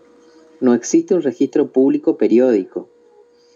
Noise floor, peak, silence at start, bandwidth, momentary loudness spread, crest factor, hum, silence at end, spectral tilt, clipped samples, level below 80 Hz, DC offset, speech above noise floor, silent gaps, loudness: -50 dBFS; -4 dBFS; 0.6 s; 7.6 kHz; 6 LU; 14 dB; none; 0.7 s; -6 dB/octave; under 0.1%; -70 dBFS; under 0.1%; 35 dB; none; -16 LUFS